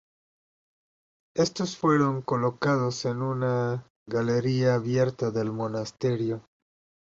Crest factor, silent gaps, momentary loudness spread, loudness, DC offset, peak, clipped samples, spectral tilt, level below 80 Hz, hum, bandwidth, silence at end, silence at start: 16 dB; 3.90-4.06 s; 7 LU; -27 LUFS; under 0.1%; -10 dBFS; under 0.1%; -6.5 dB/octave; -64 dBFS; none; 7.8 kHz; 0.7 s; 1.35 s